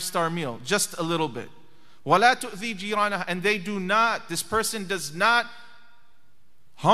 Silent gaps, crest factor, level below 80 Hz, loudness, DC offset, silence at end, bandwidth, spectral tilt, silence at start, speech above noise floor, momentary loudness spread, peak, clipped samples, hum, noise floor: none; 20 dB; -62 dBFS; -24 LUFS; 0.8%; 0 s; 15.5 kHz; -3 dB/octave; 0 s; 42 dB; 10 LU; -4 dBFS; under 0.1%; none; -67 dBFS